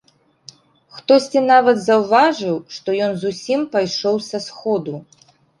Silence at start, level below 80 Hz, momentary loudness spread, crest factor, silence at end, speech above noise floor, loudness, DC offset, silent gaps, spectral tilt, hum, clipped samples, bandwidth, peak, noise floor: 0.95 s; -64 dBFS; 12 LU; 16 dB; 0.6 s; 29 dB; -17 LUFS; under 0.1%; none; -4.5 dB/octave; none; under 0.1%; 11.5 kHz; -2 dBFS; -46 dBFS